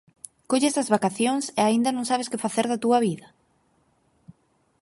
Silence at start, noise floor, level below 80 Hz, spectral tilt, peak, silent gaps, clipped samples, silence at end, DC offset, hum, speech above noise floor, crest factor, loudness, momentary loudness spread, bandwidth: 0.5 s; -66 dBFS; -72 dBFS; -4 dB/octave; -6 dBFS; none; under 0.1%; 0.5 s; under 0.1%; none; 43 dB; 20 dB; -24 LUFS; 6 LU; 11.5 kHz